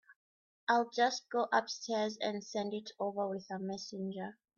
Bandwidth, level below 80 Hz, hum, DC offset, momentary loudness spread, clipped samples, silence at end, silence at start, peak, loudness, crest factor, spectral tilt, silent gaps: 7.4 kHz; -84 dBFS; none; under 0.1%; 9 LU; under 0.1%; 0.25 s; 0.1 s; -18 dBFS; -36 LUFS; 20 dB; -4 dB/octave; 0.16-0.67 s